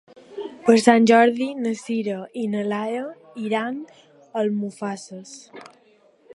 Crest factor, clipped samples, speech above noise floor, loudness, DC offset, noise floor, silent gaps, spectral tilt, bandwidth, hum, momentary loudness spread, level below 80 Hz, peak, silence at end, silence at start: 22 dB; under 0.1%; 36 dB; -21 LUFS; under 0.1%; -57 dBFS; none; -5 dB/octave; 11.5 kHz; none; 21 LU; -74 dBFS; 0 dBFS; 0.7 s; 0.3 s